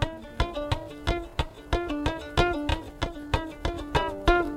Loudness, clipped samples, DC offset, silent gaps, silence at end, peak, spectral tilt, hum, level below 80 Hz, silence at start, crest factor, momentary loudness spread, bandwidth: -29 LUFS; under 0.1%; under 0.1%; none; 0 s; -6 dBFS; -6 dB/octave; none; -34 dBFS; 0 s; 22 dB; 8 LU; 16 kHz